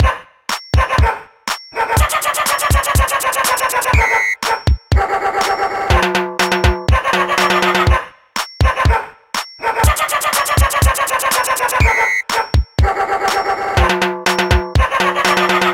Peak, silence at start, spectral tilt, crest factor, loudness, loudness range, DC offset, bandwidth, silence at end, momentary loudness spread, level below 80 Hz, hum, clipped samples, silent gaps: 0 dBFS; 0 s; -4 dB/octave; 14 dB; -15 LUFS; 1 LU; under 0.1%; 17 kHz; 0 s; 7 LU; -22 dBFS; none; under 0.1%; none